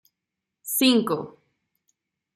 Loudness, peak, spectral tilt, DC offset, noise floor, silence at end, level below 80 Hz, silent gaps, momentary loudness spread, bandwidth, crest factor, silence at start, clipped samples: -22 LUFS; -6 dBFS; -3 dB/octave; under 0.1%; -85 dBFS; 1.05 s; -72 dBFS; none; 21 LU; 16 kHz; 20 dB; 0.65 s; under 0.1%